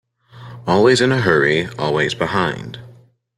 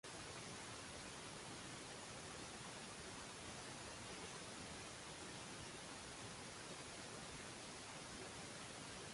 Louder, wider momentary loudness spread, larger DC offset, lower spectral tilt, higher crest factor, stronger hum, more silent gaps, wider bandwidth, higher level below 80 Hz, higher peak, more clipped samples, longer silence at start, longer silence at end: first, -16 LUFS vs -52 LUFS; first, 17 LU vs 1 LU; neither; first, -5 dB/octave vs -2.5 dB/octave; about the same, 18 dB vs 14 dB; neither; neither; about the same, 12 kHz vs 11.5 kHz; first, -52 dBFS vs -70 dBFS; first, 0 dBFS vs -40 dBFS; neither; first, 0.35 s vs 0.05 s; first, 0.45 s vs 0 s